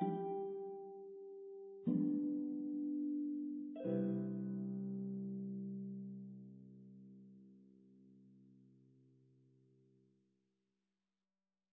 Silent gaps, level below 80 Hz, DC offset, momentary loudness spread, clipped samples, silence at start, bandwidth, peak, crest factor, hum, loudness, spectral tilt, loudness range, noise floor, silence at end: none; under -90 dBFS; under 0.1%; 20 LU; under 0.1%; 0 s; 3.6 kHz; -26 dBFS; 18 dB; none; -43 LUFS; -9.5 dB/octave; 18 LU; under -90 dBFS; 3.15 s